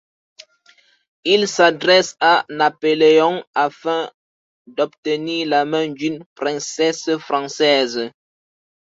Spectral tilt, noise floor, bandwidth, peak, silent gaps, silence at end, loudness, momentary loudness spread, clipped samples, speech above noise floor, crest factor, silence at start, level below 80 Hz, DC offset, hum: -3 dB/octave; -55 dBFS; 7.8 kHz; -2 dBFS; 3.47-3.53 s, 4.14-4.65 s, 4.98-5.03 s, 6.26-6.36 s; 0.75 s; -18 LUFS; 12 LU; under 0.1%; 37 dB; 18 dB; 1.25 s; -68 dBFS; under 0.1%; none